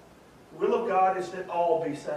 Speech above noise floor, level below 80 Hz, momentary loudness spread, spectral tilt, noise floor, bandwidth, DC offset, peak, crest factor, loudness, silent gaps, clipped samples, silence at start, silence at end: 26 dB; -68 dBFS; 8 LU; -6 dB/octave; -53 dBFS; 12 kHz; under 0.1%; -12 dBFS; 16 dB; -27 LUFS; none; under 0.1%; 0.5 s; 0 s